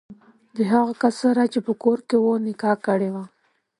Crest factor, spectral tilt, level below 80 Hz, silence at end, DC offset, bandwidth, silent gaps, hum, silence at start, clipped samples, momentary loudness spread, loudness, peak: 18 dB; -6.5 dB/octave; -70 dBFS; 0.55 s; under 0.1%; 11 kHz; none; none; 0.1 s; under 0.1%; 8 LU; -21 LUFS; -4 dBFS